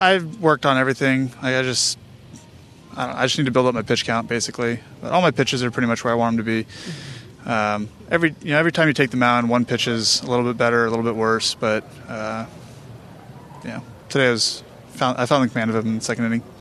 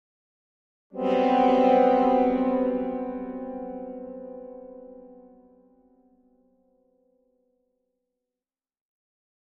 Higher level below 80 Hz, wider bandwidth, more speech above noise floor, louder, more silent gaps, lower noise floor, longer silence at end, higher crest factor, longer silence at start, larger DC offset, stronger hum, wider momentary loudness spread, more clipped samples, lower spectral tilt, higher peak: about the same, -56 dBFS vs -60 dBFS; first, 13 kHz vs 6.4 kHz; second, 25 dB vs over 69 dB; first, -20 LUFS vs -23 LUFS; neither; second, -45 dBFS vs under -90 dBFS; second, 0 s vs 4.35 s; about the same, 20 dB vs 20 dB; second, 0 s vs 0.95 s; neither; neither; second, 15 LU vs 22 LU; neither; second, -4 dB/octave vs -7.5 dB/octave; first, -2 dBFS vs -8 dBFS